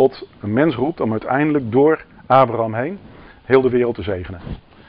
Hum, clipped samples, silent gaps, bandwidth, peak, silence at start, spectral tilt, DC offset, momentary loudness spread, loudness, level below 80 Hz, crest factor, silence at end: none; under 0.1%; none; 5.2 kHz; 0 dBFS; 0 s; -6 dB/octave; under 0.1%; 15 LU; -18 LUFS; -46 dBFS; 18 dB; 0.3 s